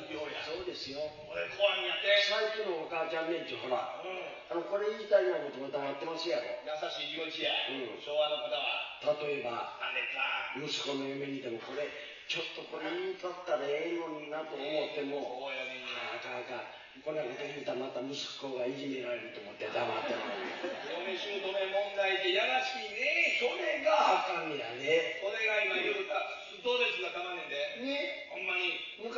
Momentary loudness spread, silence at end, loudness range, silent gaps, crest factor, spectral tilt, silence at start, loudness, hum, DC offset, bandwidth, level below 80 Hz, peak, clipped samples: 10 LU; 0 s; 8 LU; none; 20 dB; 0 dB/octave; 0 s; -34 LUFS; none; under 0.1%; 7.2 kHz; -78 dBFS; -14 dBFS; under 0.1%